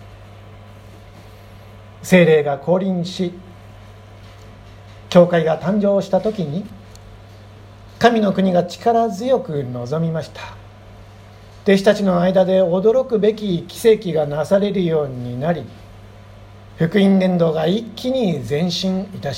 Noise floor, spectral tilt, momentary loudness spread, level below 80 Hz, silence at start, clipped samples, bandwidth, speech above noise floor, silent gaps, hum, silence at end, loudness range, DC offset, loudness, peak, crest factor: -41 dBFS; -6.5 dB/octave; 11 LU; -48 dBFS; 0 s; under 0.1%; 15.5 kHz; 24 dB; none; none; 0 s; 4 LU; under 0.1%; -17 LUFS; 0 dBFS; 18 dB